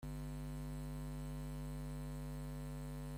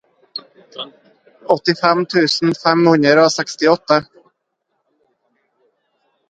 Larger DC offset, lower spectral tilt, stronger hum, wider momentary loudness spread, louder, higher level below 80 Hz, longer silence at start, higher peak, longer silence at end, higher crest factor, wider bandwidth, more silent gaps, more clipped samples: neither; first, -6.5 dB/octave vs -4.5 dB/octave; neither; second, 1 LU vs 20 LU; second, -47 LUFS vs -14 LUFS; first, -50 dBFS vs -64 dBFS; second, 0 s vs 0.35 s; second, -38 dBFS vs 0 dBFS; second, 0 s vs 2.25 s; second, 8 dB vs 18 dB; first, 16 kHz vs 9.2 kHz; neither; neither